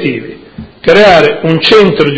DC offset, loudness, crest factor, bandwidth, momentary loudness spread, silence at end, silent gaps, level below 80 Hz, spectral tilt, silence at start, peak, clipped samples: under 0.1%; -6 LUFS; 8 dB; 8 kHz; 14 LU; 0 s; none; -38 dBFS; -6 dB/octave; 0 s; 0 dBFS; 4%